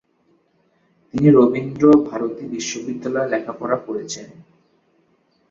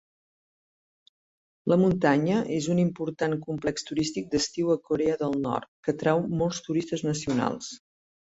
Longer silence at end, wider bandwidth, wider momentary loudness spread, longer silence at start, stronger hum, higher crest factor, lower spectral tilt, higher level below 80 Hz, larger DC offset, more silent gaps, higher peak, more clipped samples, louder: first, 1.1 s vs 0.5 s; about the same, 7.6 kHz vs 8 kHz; first, 14 LU vs 8 LU; second, 1.15 s vs 1.65 s; neither; about the same, 18 dB vs 20 dB; about the same, -6.5 dB/octave vs -5.5 dB/octave; about the same, -58 dBFS vs -58 dBFS; neither; second, none vs 5.68-5.83 s; first, -2 dBFS vs -8 dBFS; neither; first, -19 LUFS vs -27 LUFS